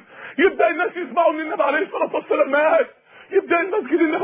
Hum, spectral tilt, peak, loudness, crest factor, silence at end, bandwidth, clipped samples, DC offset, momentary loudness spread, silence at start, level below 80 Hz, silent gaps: none; -7.5 dB/octave; -4 dBFS; -20 LUFS; 16 dB; 0 s; 3.8 kHz; under 0.1%; under 0.1%; 6 LU; 0.15 s; -64 dBFS; none